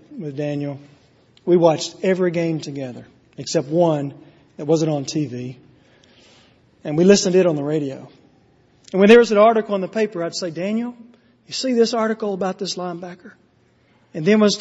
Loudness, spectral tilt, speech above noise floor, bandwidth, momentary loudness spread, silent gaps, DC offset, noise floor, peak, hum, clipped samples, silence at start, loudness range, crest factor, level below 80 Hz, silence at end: -19 LUFS; -5.5 dB/octave; 39 dB; 8 kHz; 18 LU; none; under 0.1%; -58 dBFS; 0 dBFS; none; under 0.1%; 0.1 s; 7 LU; 20 dB; -62 dBFS; 0 s